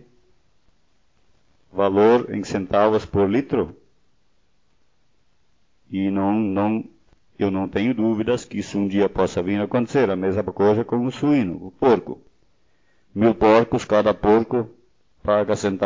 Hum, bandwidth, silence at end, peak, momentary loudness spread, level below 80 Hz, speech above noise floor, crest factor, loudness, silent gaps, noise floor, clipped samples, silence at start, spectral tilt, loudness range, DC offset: none; 7.6 kHz; 0 s; -2 dBFS; 10 LU; -48 dBFS; 47 dB; 18 dB; -21 LUFS; none; -67 dBFS; under 0.1%; 1.75 s; -7 dB/octave; 7 LU; 0.1%